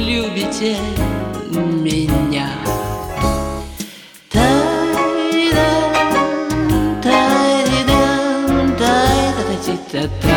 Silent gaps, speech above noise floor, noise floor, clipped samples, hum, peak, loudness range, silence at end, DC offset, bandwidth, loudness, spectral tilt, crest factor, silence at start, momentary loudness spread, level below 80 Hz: none; 19 dB; -37 dBFS; under 0.1%; none; 0 dBFS; 5 LU; 0 s; under 0.1%; 20 kHz; -16 LUFS; -5 dB/octave; 16 dB; 0 s; 9 LU; -30 dBFS